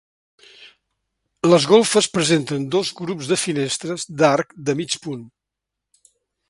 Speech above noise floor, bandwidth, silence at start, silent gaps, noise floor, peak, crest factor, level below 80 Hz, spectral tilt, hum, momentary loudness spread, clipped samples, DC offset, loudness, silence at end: 64 dB; 11.5 kHz; 0.6 s; none; -83 dBFS; 0 dBFS; 22 dB; -62 dBFS; -4 dB/octave; none; 12 LU; under 0.1%; under 0.1%; -19 LUFS; 1.25 s